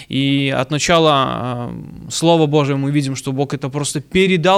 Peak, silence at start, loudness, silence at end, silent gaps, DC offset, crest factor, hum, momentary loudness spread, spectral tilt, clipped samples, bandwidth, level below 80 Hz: -2 dBFS; 0 s; -17 LUFS; 0 s; none; under 0.1%; 16 dB; none; 11 LU; -5 dB/octave; under 0.1%; 14.5 kHz; -46 dBFS